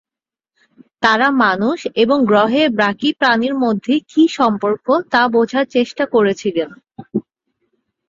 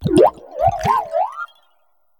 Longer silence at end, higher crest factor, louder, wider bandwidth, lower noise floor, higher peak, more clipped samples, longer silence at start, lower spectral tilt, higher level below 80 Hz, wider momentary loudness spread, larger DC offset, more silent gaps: first, 0.9 s vs 0.75 s; about the same, 16 dB vs 18 dB; first, -15 LUFS vs -18 LUFS; second, 7.8 kHz vs 19 kHz; first, -89 dBFS vs -65 dBFS; about the same, -2 dBFS vs 0 dBFS; neither; first, 1 s vs 0 s; about the same, -5.5 dB/octave vs -6.5 dB/octave; second, -60 dBFS vs -44 dBFS; second, 8 LU vs 15 LU; neither; neither